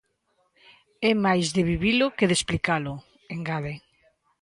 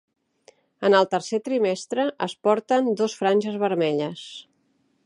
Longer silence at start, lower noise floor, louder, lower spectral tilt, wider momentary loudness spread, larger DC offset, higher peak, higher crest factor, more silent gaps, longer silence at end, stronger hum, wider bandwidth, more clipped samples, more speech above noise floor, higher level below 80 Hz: first, 1 s vs 0.8 s; first, -71 dBFS vs -67 dBFS; about the same, -24 LUFS vs -23 LUFS; about the same, -4.5 dB/octave vs -5 dB/octave; first, 14 LU vs 9 LU; neither; about the same, -6 dBFS vs -4 dBFS; about the same, 20 dB vs 20 dB; neither; about the same, 0.65 s vs 0.65 s; neither; about the same, 11.5 kHz vs 11 kHz; neither; about the same, 47 dB vs 45 dB; first, -48 dBFS vs -78 dBFS